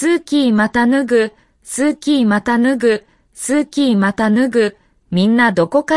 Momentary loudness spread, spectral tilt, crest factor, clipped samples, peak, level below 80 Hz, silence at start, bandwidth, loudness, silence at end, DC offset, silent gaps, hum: 7 LU; -5 dB/octave; 12 dB; under 0.1%; -2 dBFS; -52 dBFS; 0 s; 12 kHz; -15 LUFS; 0 s; under 0.1%; none; none